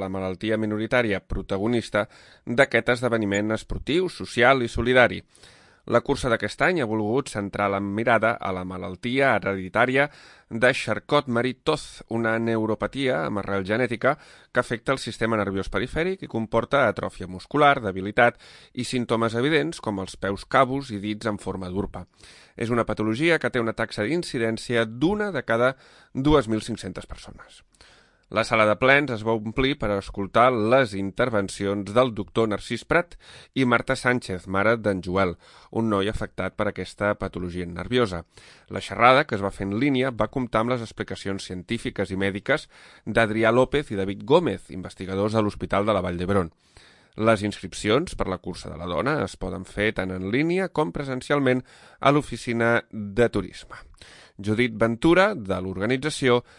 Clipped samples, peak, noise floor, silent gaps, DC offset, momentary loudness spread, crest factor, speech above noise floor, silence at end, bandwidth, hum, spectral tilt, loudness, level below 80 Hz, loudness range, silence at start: under 0.1%; -2 dBFS; -55 dBFS; none; under 0.1%; 12 LU; 22 dB; 31 dB; 0.15 s; 11.5 kHz; none; -5.5 dB/octave; -24 LUFS; -46 dBFS; 4 LU; 0 s